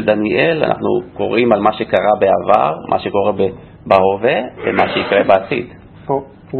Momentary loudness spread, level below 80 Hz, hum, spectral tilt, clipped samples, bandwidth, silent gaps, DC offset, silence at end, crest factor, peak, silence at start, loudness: 9 LU; -48 dBFS; none; -8 dB/octave; under 0.1%; 4.8 kHz; none; under 0.1%; 0 s; 14 dB; 0 dBFS; 0 s; -15 LUFS